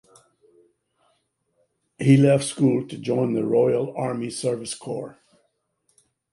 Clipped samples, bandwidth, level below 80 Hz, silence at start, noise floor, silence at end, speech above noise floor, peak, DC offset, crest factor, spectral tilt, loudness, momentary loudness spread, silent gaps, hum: under 0.1%; 11.5 kHz; -66 dBFS; 2 s; -71 dBFS; 1.2 s; 50 dB; -4 dBFS; under 0.1%; 20 dB; -6.5 dB/octave; -22 LUFS; 14 LU; none; none